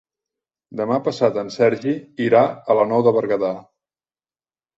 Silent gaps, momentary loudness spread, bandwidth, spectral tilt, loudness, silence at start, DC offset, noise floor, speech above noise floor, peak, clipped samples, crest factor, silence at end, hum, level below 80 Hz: none; 9 LU; 8 kHz; -7 dB/octave; -19 LUFS; 0.7 s; under 0.1%; under -90 dBFS; over 72 dB; -2 dBFS; under 0.1%; 18 dB; 1.15 s; none; -64 dBFS